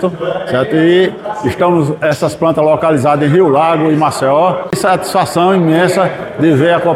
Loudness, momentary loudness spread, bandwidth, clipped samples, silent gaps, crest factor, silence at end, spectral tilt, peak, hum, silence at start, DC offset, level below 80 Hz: -12 LUFS; 6 LU; 15 kHz; under 0.1%; none; 10 dB; 0 s; -6.5 dB/octave; 0 dBFS; none; 0 s; under 0.1%; -48 dBFS